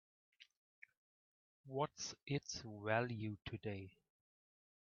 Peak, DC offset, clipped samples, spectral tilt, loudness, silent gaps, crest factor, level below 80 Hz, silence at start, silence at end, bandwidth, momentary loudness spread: -22 dBFS; under 0.1%; under 0.1%; -4.5 dB/octave; -44 LUFS; 0.57-0.82 s, 0.97-1.64 s; 26 dB; -76 dBFS; 0.4 s; 1 s; 7 kHz; 26 LU